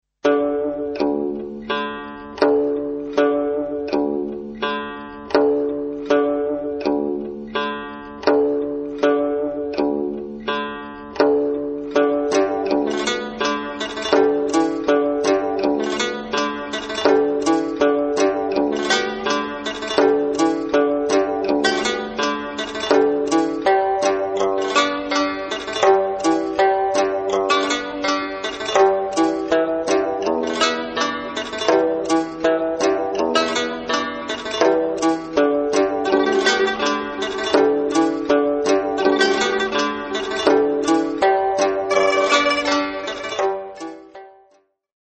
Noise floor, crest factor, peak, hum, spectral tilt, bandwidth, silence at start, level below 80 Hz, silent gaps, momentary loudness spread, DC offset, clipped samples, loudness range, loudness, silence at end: -59 dBFS; 20 dB; 0 dBFS; none; -3 dB/octave; 8.8 kHz; 0.25 s; -54 dBFS; none; 8 LU; under 0.1%; under 0.1%; 3 LU; -20 LUFS; 0.7 s